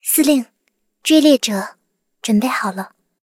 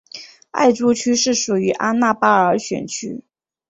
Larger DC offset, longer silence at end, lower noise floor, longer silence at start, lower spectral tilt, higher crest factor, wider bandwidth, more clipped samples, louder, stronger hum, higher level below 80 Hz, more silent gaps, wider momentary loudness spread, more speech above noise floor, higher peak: neither; about the same, 0.4 s vs 0.5 s; first, -66 dBFS vs -40 dBFS; about the same, 0.05 s vs 0.15 s; about the same, -3.5 dB/octave vs -3.5 dB/octave; about the same, 16 dB vs 18 dB; first, 17 kHz vs 8 kHz; neither; about the same, -16 LUFS vs -17 LUFS; neither; about the same, -64 dBFS vs -60 dBFS; neither; first, 19 LU vs 16 LU; first, 51 dB vs 23 dB; about the same, -2 dBFS vs -2 dBFS